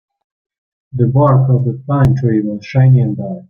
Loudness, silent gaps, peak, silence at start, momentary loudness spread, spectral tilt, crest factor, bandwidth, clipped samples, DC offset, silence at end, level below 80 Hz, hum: -13 LUFS; none; -2 dBFS; 0.95 s; 7 LU; -10.5 dB/octave; 12 dB; 5.6 kHz; under 0.1%; under 0.1%; 0.1 s; -40 dBFS; none